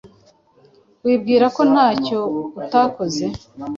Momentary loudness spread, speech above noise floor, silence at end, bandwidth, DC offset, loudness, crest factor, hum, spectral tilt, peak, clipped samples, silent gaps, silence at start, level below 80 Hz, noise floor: 11 LU; 36 dB; 0 s; 7.6 kHz; under 0.1%; -18 LUFS; 16 dB; none; -5.5 dB/octave; -4 dBFS; under 0.1%; none; 0.05 s; -54 dBFS; -54 dBFS